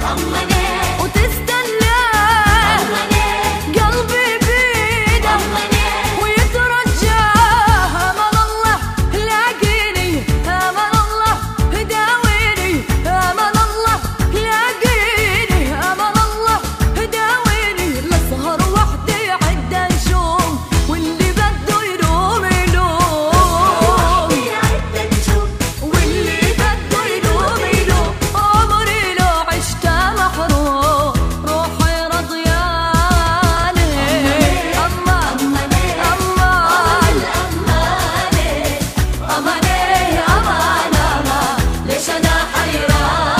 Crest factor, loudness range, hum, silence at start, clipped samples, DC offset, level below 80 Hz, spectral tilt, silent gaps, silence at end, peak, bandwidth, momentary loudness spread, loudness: 14 dB; 2 LU; none; 0 s; under 0.1%; under 0.1%; -22 dBFS; -4 dB/octave; none; 0 s; 0 dBFS; 15.5 kHz; 5 LU; -14 LUFS